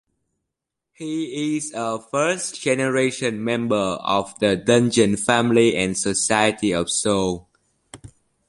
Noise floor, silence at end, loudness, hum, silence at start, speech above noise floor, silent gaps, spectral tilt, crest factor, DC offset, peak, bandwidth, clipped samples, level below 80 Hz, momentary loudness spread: -82 dBFS; 0.4 s; -21 LUFS; none; 1 s; 62 dB; none; -4 dB/octave; 20 dB; under 0.1%; -2 dBFS; 11.5 kHz; under 0.1%; -52 dBFS; 9 LU